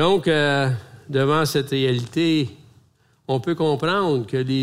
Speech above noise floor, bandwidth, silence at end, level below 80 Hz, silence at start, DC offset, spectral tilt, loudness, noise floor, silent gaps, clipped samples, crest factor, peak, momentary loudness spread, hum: 39 dB; 16 kHz; 0 s; -58 dBFS; 0 s; under 0.1%; -6 dB/octave; -21 LUFS; -59 dBFS; none; under 0.1%; 14 dB; -6 dBFS; 8 LU; none